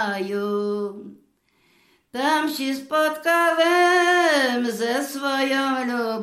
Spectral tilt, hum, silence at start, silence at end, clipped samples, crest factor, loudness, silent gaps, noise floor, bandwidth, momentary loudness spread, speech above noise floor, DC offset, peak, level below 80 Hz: -3 dB/octave; none; 0 s; 0 s; under 0.1%; 14 dB; -21 LUFS; none; -63 dBFS; 15.5 kHz; 10 LU; 42 dB; under 0.1%; -8 dBFS; -78 dBFS